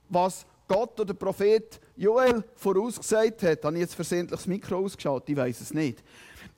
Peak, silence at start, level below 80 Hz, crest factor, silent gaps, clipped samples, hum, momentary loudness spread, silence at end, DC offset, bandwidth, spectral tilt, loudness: -12 dBFS; 0.1 s; -60 dBFS; 16 dB; none; under 0.1%; none; 7 LU; 0.1 s; under 0.1%; 16.5 kHz; -5.5 dB/octave; -27 LUFS